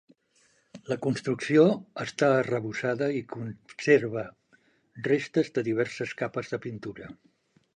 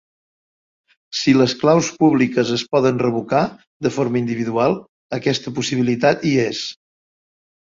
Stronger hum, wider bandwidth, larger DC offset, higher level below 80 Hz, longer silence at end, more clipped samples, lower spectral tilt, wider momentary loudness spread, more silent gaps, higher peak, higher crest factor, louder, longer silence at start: neither; first, 9.8 kHz vs 7.6 kHz; neither; second, -68 dBFS vs -58 dBFS; second, 0.6 s vs 1.05 s; neither; about the same, -6.5 dB/octave vs -5.5 dB/octave; first, 16 LU vs 10 LU; second, none vs 3.67-3.80 s, 4.89-5.09 s; second, -8 dBFS vs -2 dBFS; about the same, 20 dB vs 16 dB; second, -27 LUFS vs -18 LUFS; second, 0.75 s vs 1.1 s